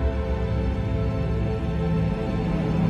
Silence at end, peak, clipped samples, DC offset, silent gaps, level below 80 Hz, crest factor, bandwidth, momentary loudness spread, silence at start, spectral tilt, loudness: 0 s; -12 dBFS; under 0.1%; under 0.1%; none; -28 dBFS; 12 dB; 7.4 kHz; 2 LU; 0 s; -9 dB/octave; -26 LUFS